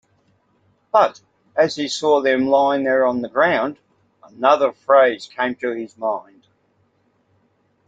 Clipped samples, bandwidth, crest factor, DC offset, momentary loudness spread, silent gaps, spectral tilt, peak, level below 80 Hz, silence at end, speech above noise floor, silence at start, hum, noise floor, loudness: under 0.1%; 8.4 kHz; 20 dB; under 0.1%; 10 LU; none; -4 dB/octave; 0 dBFS; -68 dBFS; 1.7 s; 45 dB; 0.95 s; none; -63 dBFS; -18 LUFS